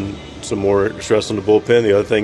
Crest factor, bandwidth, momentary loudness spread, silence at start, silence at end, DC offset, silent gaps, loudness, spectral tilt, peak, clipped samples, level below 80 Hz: 14 dB; 11.5 kHz; 12 LU; 0 s; 0 s; under 0.1%; none; -16 LUFS; -5.5 dB/octave; -2 dBFS; under 0.1%; -44 dBFS